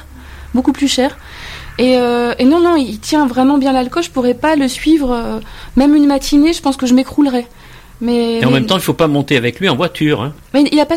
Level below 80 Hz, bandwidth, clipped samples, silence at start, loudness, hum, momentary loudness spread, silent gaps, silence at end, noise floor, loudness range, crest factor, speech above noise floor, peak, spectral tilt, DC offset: -34 dBFS; 16 kHz; under 0.1%; 0 s; -13 LUFS; none; 8 LU; none; 0 s; -33 dBFS; 1 LU; 12 dB; 20 dB; 0 dBFS; -5 dB/octave; under 0.1%